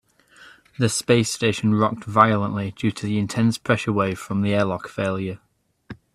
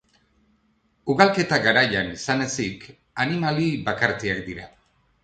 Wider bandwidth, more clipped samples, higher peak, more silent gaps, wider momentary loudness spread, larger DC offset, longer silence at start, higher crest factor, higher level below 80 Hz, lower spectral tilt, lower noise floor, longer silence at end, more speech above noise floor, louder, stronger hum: first, 14 kHz vs 9.2 kHz; neither; about the same, 0 dBFS vs -2 dBFS; neither; second, 8 LU vs 17 LU; neither; second, 0.4 s vs 1.05 s; about the same, 22 dB vs 22 dB; about the same, -56 dBFS vs -54 dBFS; about the same, -5.5 dB/octave vs -4.5 dB/octave; second, -50 dBFS vs -66 dBFS; second, 0.2 s vs 0.55 s; second, 29 dB vs 43 dB; about the same, -22 LUFS vs -22 LUFS; neither